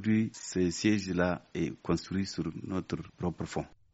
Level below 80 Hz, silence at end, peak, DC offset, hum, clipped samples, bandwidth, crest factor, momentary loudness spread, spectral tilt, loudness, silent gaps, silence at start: -56 dBFS; 0.25 s; -14 dBFS; under 0.1%; none; under 0.1%; 8 kHz; 18 dB; 8 LU; -6 dB/octave; -33 LUFS; none; 0 s